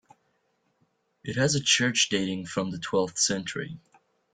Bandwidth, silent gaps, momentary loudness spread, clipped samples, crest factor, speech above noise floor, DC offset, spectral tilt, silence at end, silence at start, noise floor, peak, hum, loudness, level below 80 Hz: 10 kHz; none; 15 LU; under 0.1%; 20 dB; 45 dB; under 0.1%; -3 dB/octave; 0.55 s; 1.25 s; -72 dBFS; -8 dBFS; none; -26 LUFS; -64 dBFS